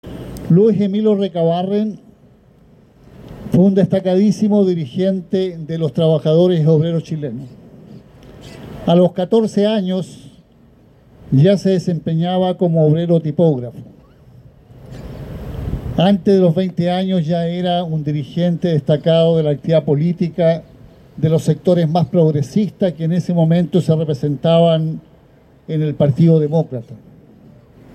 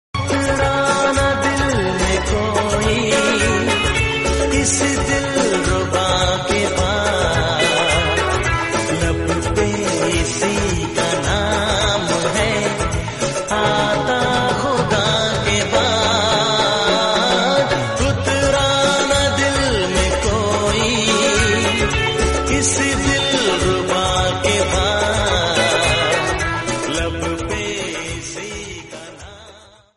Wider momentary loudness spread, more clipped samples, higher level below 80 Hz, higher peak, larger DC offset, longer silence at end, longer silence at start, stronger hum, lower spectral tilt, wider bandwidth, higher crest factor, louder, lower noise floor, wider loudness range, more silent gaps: first, 13 LU vs 6 LU; neither; second, -44 dBFS vs -30 dBFS; about the same, -4 dBFS vs -2 dBFS; neither; first, 1 s vs 0.4 s; about the same, 0.05 s vs 0.15 s; neither; first, -8.5 dB/octave vs -3.5 dB/octave; second, 8.8 kHz vs 11.5 kHz; about the same, 14 dB vs 16 dB; about the same, -16 LUFS vs -17 LUFS; first, -48 dBFS vs -44 dBFS; about the same, 3 LU vs 2 LU; neither